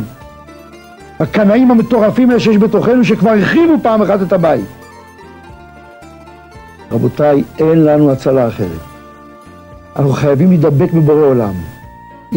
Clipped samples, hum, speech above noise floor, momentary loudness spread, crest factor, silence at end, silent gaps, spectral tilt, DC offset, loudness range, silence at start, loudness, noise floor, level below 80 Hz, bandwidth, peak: under 0.1%; none; 26 dB; 11 LU; 10 dB; 0 s; none; -8.5 dB/octave; under 0.1%; 7 LU; 0 s; -11 LUFS; -36 dBFS; -42 dBFS; 16.5 kHz; -2 dBFS